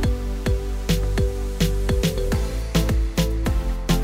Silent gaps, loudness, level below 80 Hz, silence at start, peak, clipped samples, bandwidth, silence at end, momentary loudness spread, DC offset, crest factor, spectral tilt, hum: none; -24 LUFS; -24 dBFS; 0 s; -6 dBFS; under 0.1%; 16 kHz; 0 s; 3 LU; under 0.1%; 16 dB; -5.5 dB/octave; none